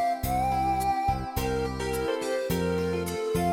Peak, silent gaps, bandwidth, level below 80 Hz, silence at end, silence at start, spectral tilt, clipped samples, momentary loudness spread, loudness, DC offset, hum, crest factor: -14 dBFS; none; 17 kHz; -40 dBFS; 0 s; 0 s; -5.5 dB/octave; under 0.1%; 4 LU; -28 LUFS; under 0.1%; none; 14 dB